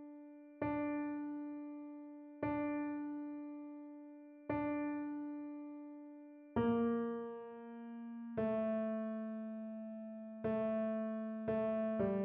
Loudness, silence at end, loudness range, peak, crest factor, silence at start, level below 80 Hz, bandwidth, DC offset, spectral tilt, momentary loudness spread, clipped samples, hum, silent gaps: -41 LUFS; 0 s; 4 LU; -24 dBFS; 16 dB; 0 s; -70 dBFS; 3.8 kHz; under 0.1%; -7.5 dB/octave; 15 LU; under 0.1%; none; none